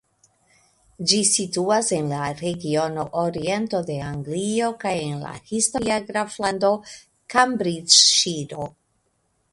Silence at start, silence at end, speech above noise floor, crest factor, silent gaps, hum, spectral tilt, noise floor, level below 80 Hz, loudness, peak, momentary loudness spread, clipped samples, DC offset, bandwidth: 1 s; 0.8 s; 47 dB; 22 dB; none; none; -2.5 dB/octave; -69 dBFS; -58 dBFS; -21 LUFS; 0 dBFS; 14 LU; under 0.1%; under 0.1%; 11.5 kHz